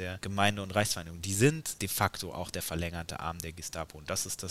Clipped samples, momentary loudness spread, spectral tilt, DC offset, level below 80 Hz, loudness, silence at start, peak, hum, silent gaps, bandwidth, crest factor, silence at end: under 0.1%; 11 LU; -4 dB/octave; 0.2%; -56 dBFS; -32 LUFS; 0 s; -10 dBFS; none; none; 16 kHz; 24 dB; 0 s